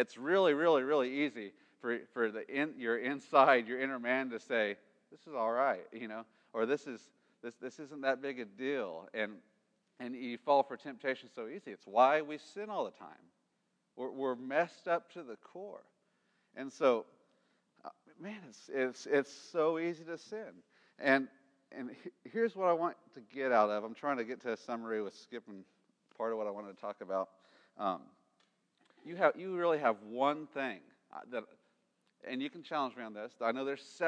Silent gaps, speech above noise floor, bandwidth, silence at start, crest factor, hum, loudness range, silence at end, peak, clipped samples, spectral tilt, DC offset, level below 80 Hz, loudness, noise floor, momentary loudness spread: none; 45 dB; 9.8 kHz; 0 s; 24 dB; none; 8 LU; 0 s; -12 dBFS; under 0.1%; -5 dB/octave; under 0.1%; under -90 dBFS; -35 LUFS; -80 dBFS; 19 LU